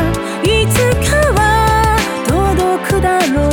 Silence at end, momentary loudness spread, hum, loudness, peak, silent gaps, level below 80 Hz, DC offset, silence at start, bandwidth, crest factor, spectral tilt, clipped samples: 0 s; 4 LU; none; -13 LUFS; 0 dBFS; none; -22 dBFS; under 0.1%; 0 s; over 20 kHz; 12 dB; -5 dB/octave; under 0.1%